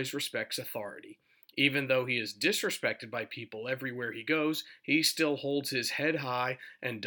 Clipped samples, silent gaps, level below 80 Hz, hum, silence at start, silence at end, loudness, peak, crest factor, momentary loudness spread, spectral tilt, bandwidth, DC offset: under 0.1%; none; -86 dBFS; none; 0 s; 0 s; -31 LUFS; -10 dBFS; 22 dB; 11 LU; -3.5 dB/octave; over 20 kHz; under 0.1%